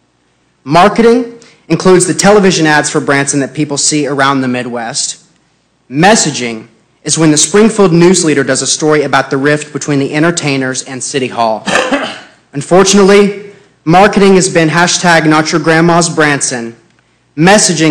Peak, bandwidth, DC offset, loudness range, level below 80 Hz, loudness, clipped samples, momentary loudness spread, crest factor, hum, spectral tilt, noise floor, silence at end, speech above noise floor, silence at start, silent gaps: 0 dBFS; 14.5 kHz; under 0.1%; 4 LU; -42 dBFS; -9 LUFS; under 0.1%; 11 LU; 10 dB; none; -4 dB/octave; -54 dBFS; 0 s; 46 dB; 0.65 s; none